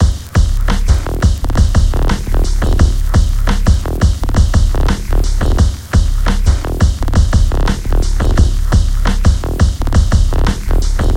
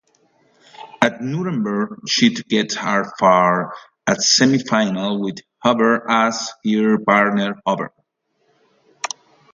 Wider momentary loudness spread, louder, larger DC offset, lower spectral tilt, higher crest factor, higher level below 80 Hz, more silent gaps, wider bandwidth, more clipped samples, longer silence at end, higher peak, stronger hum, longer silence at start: second, 4 LU vs 12 LU; first, -15 LUFS vs -18 LUFS; neither; first, -6 dB/octave vs -4 dB/octave; second, 10 dB vs 18 dB; first, -12 dBFS vs -66 dBFS; neither; first, 15.5 kHz vs 7.8 kHz; neither; second, 0 s vs 0.45 s; about the same, 0 dBFS vs 0 dBFS; neither; second, 0 s vs 0.8 s